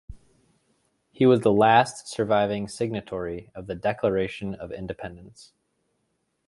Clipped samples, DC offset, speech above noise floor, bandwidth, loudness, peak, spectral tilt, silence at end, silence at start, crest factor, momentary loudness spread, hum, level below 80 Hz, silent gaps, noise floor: under 0.1%; under 0.1%; 50 dB; 11.5 kHz; -24 LUFS; -4 dBFS; -6 dB/octave; 1.05 s; 0.1 s; 22 dB; 17 LU; none; -54 dBFS; none; -74 dBFS